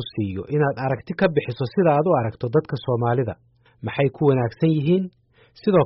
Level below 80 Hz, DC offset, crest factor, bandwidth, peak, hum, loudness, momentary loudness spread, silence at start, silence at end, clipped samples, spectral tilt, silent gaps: -56 dBFS; under 0.1%; 14 dB; 5.8 kHz; -6 dBFS; none; -22 LUFS; 9 LU; 0 s; 0 s; under 0.1%; -7 dB/octave; none